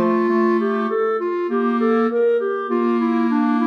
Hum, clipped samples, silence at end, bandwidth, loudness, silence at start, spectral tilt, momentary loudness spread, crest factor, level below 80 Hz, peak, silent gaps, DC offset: none; under 0.1%; 0 s; 6 kHz; -19 LUFS; 0 s; -8 dB/octave; 3 LU; 10 dB; -78 dBFS; -8 dBFS; none; under 0.1%